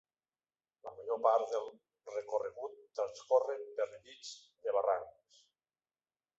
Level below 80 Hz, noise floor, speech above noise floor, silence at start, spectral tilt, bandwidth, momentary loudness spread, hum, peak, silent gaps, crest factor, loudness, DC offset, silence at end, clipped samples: -84 dBFS; under -90 dBFS; over 54 dB; 0.85 s; -0.5 dB/octave; 8 kHz; 18 LU; none; -16 dBFS; none; 22 dB; -36 LUFS; under 0.1%; 1.3 s; under 0.1%